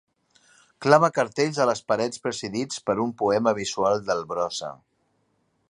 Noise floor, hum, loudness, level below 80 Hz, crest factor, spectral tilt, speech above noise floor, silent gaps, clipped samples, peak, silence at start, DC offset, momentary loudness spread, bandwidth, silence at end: -70 dBFS; none; -24 LUFS; -64 dBFS; 24 dB; -4.5 dB/octave; 46 dB; none; under 0.1%; -2 dBFS; 0.8 s; under 0.1%; 11 LU; 11.5 kHz; 0.95 s